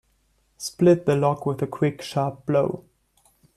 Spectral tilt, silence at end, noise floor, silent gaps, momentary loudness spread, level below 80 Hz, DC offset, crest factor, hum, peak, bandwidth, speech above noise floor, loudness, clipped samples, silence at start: -7 dB/octave; 0.75 s; -66 dBFS; none; 13 LU; -60 dBFS; under 0.1%; 18 dB; none; -6 dBFS; 14 kHz; 44 dB; -23 LUFS; under 0.1%; 0.6 s